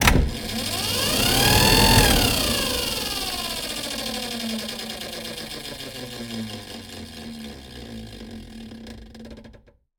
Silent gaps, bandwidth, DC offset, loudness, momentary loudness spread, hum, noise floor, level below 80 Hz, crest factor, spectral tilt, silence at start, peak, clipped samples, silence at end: none; 19.5 kHz; under 0.1%; -21 LUFS; 24 LU; none; -51 dBFS; -32 dBFS; 24 dB; -3 dB/octave; 0 s; 0 dBFS; under 0.1%; 0.45 s